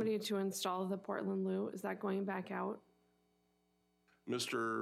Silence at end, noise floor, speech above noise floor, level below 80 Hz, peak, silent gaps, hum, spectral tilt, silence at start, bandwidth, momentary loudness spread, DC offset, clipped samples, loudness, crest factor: 0 s; -78 dBFS; 39 dB; -88 dBFS; -26 dBFS; none; none; -4.5 dB/octave; 0 s; 15.5 kHz; 6 LU; under 0.1%; under 0.1%; -40 LUFS; 14 dB